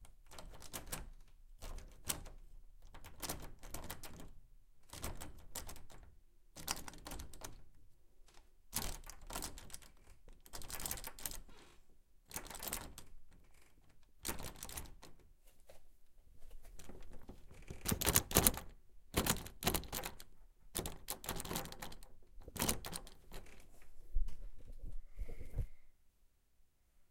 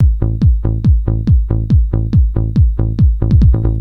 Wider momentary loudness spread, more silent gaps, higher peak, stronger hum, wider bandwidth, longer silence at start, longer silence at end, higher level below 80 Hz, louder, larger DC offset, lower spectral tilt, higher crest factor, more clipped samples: first, 22 LU vs 3 LU; neither; second, -10 dBFS vs 0 dBFS; neither; first, 17 kHz vs 4.6 kHz; about the same, 0 s vs 0 s; about the same, 0.05 s vs 0 s; second, -50 dBFS vs -14 dBFS; second, -42 LUFS vs -14 LUFS; second, under 0.1% vs 0.8%; second, -2.5 dB/octave vs -11 dB/octave; first, 34 dB vs 10 dB; neither